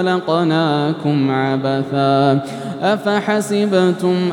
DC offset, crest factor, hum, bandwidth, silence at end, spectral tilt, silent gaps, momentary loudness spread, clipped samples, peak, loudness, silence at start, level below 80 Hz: under 0.1%; 14 dB; none; 17.5 kHz; 0 s; -6.5 dB/octave; none; 4 LU; under 0.1%; -2 dBFS; -17 LUFS; 0 s; -70 dBFS